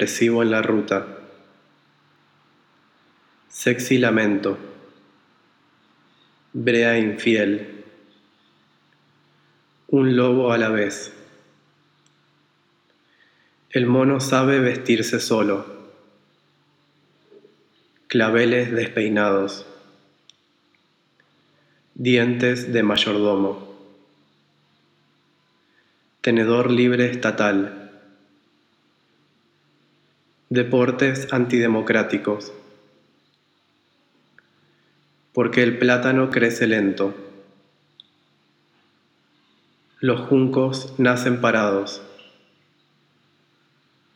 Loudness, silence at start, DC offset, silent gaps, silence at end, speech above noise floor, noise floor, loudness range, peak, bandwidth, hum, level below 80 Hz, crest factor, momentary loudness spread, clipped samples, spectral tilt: -20 LUFS; 0 s; under 0.1%; none; 2.1 s; 45 dB; -64 dBFS; 7 LU; -2 dBFS; 17.5 kHz; none; -74 dBFS; 20 dB; 11 LU; under 0.1%; -5.5 dB/octave